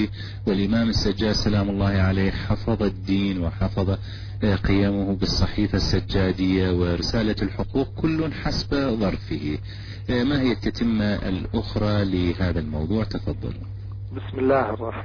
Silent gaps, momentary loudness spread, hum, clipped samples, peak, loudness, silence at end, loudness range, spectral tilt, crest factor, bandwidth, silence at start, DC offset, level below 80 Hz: none; 8 LU; none; under 0.1%; -8 dBFS; -24 LUFS; 0 s; 3 LU; -7 dB/octave; 14 dB; 5.4 kHz; 0 s; under 0.1%; -34 dBFS